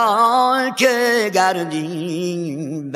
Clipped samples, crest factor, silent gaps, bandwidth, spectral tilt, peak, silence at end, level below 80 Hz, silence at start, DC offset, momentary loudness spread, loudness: under 0.1%; 18 dB; none; 16 kHz; -4 dB/octave; 0 dBFS; 0 s; -74 dBFS; 0 s; under 0.1%; 10 LU; -18 LUFS